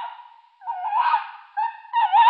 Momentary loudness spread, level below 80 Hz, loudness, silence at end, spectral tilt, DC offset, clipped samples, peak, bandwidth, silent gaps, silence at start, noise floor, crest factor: 16 LU; under -90 dBFS; -24 LUFS; 0 s; 2 dB/octave; under 0.1%; under 0.1%; -6 dBFS; 5 kHz; none; 0 s; -47 dBFS; 16 dB